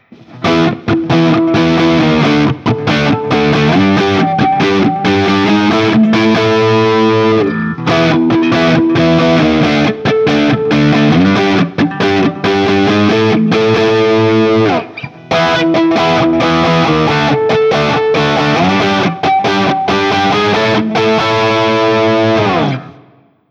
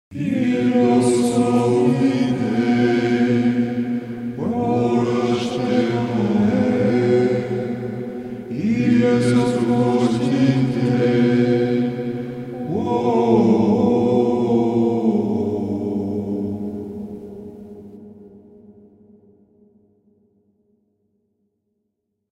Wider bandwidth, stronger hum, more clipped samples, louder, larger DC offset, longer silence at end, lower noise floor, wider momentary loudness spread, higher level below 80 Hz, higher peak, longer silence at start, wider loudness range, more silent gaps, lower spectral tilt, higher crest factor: second, 7.8 kHz vs 11 kHz; neither; neither; first, -11 LUFS vs -19 LUFS; neither; second, 0.6 s vs 3.6 s; second, -46 dBFS vs -75 dBFS; second, 3 LU vs 13 LU; first, -40 dBFS vs -56 dBFS; about the same, 0 dBFS vs -2 dBFS; first, 0.3 s vs 0.1 s; second, 1 LU vs 9 LU; neither; about the same, -6.5 dB/octave vs -7.5 dB/octave; second, 10 dB vs 16 dB